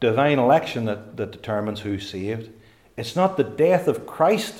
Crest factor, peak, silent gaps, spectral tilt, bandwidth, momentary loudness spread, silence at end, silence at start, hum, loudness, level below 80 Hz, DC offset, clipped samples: 16 dB; -6 dBFS; none; -6 dB/octave; 16.5 kHz; 13 LU; 0 s; 0 s; none; -22 LUFS; -62 dBFS; under 0.1%; under 0.1%